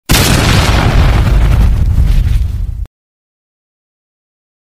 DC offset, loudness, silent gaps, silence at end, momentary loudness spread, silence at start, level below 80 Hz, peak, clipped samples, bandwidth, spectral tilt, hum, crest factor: under 0.1%; -11 LUFS; none; 1.8 s; 12 LU; 0.1 s; -12 dBFS; 0 dBFS; 0.4%; 16 kHz; -4.5 dB/octave; none; 10 dB